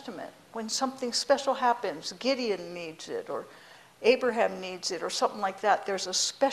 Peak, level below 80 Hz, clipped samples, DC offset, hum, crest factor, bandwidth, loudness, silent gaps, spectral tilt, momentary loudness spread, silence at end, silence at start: -8 dBFS; -74 dBFS; under 0.1%; under 0.1%; none; 20 dB; 14 kHz; -29 LUFS; none; -2 dB/octave; 14 LU; 0 s; 0 s